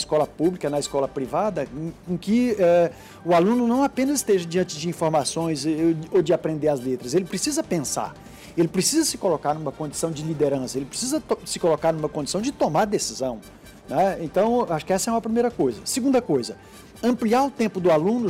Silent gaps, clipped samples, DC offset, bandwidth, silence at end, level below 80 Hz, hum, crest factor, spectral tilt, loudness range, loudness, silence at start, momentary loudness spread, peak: none; under 0.1%; under 0.1%; 16 kHz; 0 s; -54 dBFS; none; 12 dB; -5 dB/octave; 3 LU; -23 LUFS; 0 s; 8 LU; -10 dBFS